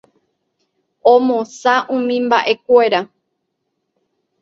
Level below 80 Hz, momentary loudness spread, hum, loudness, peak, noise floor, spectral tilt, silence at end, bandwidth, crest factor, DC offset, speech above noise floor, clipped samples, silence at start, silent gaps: -68 dBFS; 6 LU; none; -15 LUFS; 0 dBFS; -72 dBFS; -4 dB/octave; 1.35 s; 7.8 kHz; 18 dB; under 0.1%; 58 dB; under 0.1%; 1.05 s; none